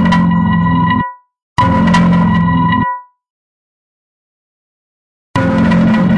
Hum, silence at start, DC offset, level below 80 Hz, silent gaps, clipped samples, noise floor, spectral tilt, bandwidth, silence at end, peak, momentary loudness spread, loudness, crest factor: none; 0 s; under 0.1%; -36 dBFS; 1.42-1.56 s, 3.30-5.34 s; under 0.1%; under -90 dBFS; -7.5 dB/octave; 8.6 kHz; 0 s; 0 dBFS; 10 LU; -12 LUFS; 12 dB